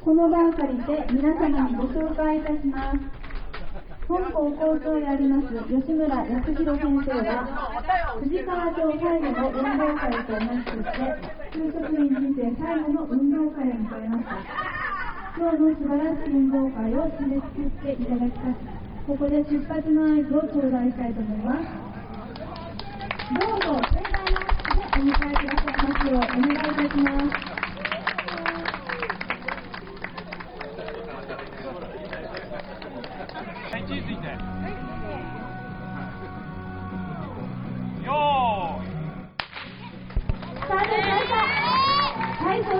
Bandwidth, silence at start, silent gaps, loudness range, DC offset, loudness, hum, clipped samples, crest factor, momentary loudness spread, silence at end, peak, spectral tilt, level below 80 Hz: 5.6 kHz; 0 s; none; 10 LU; under 0.1%; -26 LUFS; none; under 0.1%; 18 dB; 14 LU; 0 s; -6 dBFS; -9.5 dB/octave; -34 dBFS